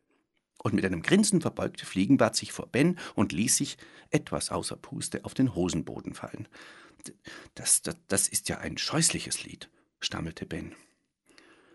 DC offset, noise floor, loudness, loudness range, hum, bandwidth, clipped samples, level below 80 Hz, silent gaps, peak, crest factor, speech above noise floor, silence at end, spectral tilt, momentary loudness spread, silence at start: under 0.1%; -74 dBFS; -28 LUFS; 6 LU; none; 12 kHz; under 0.1%; -58 dBFS; none; -8 dBFS; 24 dB; 45 dB; 1 s; -3.5 dB/octave; 21 LU; 0.65 s